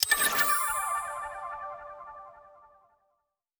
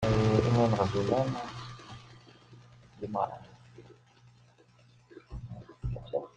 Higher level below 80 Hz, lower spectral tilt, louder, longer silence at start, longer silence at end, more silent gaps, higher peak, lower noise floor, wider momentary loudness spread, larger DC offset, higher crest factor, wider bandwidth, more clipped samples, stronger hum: second, -62 dBFS vs -50 dBFS; second, 1 dB/octave vs -7.5 dB/octave; about the same, -28 LUFS vs -30 LUFS; about the same, 0 s vs 0 s; first, 1 s vs 0.1 s; neither; about the same, -8 dBFS vs -10 dBFS; first, -79 dBFS vs -61 dBFS; about the same, 22 LU vs 22 LU; neither; about the same, 24 dB vs 22 dB; first, over 20 kHz vs 9 kHz; neither; second, none vs 60 Hz at -65 dBFS